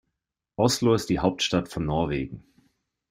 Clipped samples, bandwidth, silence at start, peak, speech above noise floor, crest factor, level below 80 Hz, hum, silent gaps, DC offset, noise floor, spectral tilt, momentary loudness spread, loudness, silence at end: under 0.1%; 16 kHz; 0.6 s; -6 dBFS; 58 dB; 20 dB; -48 dBFS; none; none; under 0.1%; -83 dBFS; -5 dB/octave; 14 LU; -25 LUFS; 0.7 s